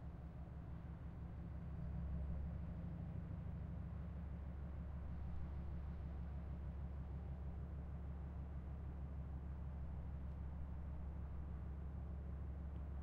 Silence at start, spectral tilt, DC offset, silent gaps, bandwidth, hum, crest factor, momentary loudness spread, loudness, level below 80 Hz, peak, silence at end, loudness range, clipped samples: 0 s; -9.5 dB/octave; under 0.1%; none; 3.6 kHz; none; 12 dB; 3 LU; -50 LUFS; -50 dBFS; -36 dBFS; 0 s; 1 LU; under 0.1%